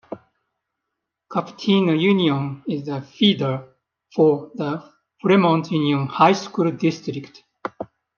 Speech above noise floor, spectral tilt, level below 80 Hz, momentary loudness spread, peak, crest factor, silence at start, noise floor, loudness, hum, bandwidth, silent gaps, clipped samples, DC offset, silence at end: 61 dB; -6.5 dB/octave; -68 dBFS; 16 LU; -2 dBFS; 18 dB; 0.1 s; -81 dBFS; -20 LUFS; none; 7 kHz; none; under 0.1%; under 0.1%; 0.3 s